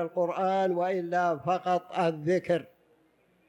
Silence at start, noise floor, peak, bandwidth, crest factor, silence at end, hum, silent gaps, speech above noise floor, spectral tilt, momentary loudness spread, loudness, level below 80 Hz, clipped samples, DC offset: 0 s; -66 dBFS; -14 dBFS; 10.5 kHz; 14 dB; 0.85 s; none; none; 39 dB; -7 dB/octave; 3 LU; -28 LUFS; -74 dBFS; under 0.1%; under 0.1%